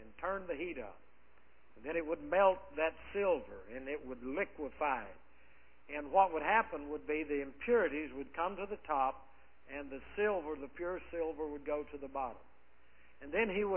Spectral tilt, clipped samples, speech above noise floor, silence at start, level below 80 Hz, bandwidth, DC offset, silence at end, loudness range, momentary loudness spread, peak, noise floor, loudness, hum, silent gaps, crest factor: -3 dB/octave; under 0.1%; 32 dB; 0 s; -62 dBFS; 3.3 kHz; 0.2%; 0 s; 5 LU; 15 LU; -14 dBFS; -68 dBFS; -37 LUFS; none; none; 22 dB